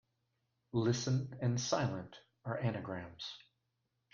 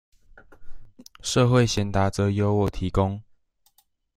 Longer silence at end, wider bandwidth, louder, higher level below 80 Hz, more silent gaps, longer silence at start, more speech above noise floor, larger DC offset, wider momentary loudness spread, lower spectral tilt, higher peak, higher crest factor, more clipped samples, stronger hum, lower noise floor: second, 0.75 s vs 0.95 s; second, 7.4 kHz vs 15.5 kHz; second, -38 LUFS vs -23 LUFS; second, -70 dBFS vs -42 dBFS; neither; first, 0.75 s vs 0.6 s; first, 47 dB vs 43 dB; neither; first, 13 LU vs 8 LU; about the same, -5.5 dB/octave vs -6 dB/octave; second, -20 dBFS vs -4 dBFS; about the same, 20 dB vs 20 dB; neither; neither; first, -84 dBFS vs -65 dBFS